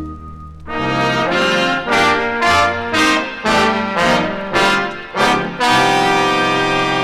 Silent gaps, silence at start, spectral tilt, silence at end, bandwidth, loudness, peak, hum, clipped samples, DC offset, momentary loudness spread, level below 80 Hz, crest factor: none; 0 s; -3.5 dB/octave; 0 s; 17 kHz; -14 LUFS; 0 dBFS; none; under 0.1%; under 0.1%; 7 LU; -40 dBFS; 14 dB